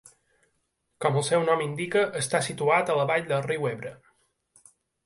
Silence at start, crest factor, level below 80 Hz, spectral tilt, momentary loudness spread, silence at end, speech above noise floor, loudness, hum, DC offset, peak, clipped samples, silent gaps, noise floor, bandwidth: 1 s; 18 dB; -68 dBFS; -4.5 dB/octave; 6 LU; 1.1 s; 50 dB; -26 LUFS; none; under 0.1%; -10 dBFS; under 0.1%; none; -75 dBFS; 11.5 kHz